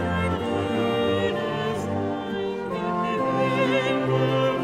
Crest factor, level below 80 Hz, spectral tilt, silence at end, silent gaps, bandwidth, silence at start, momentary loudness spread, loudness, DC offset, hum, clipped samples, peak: 14 dB; -50 dBFS; -6.5 dB/octave; 0 s; none; 15 kHz; 0 s; 6 LU; -24 LUFS; under 0.1%; none; under 0.1%; -10 dBFS